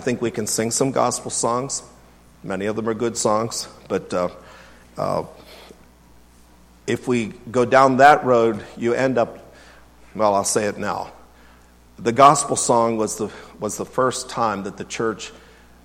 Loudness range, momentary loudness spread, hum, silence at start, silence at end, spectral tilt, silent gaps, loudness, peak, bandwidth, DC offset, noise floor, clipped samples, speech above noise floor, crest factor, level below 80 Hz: 9 LU; 16 LU; none; 0 s; 0.5 s; -4 dB/octave; none; -20 LUFS; 0 dBFS; 16 kHz; under 0.1%; -50 dBFS; under 0.1%; 30 dB; 22 dB; -54 dBFS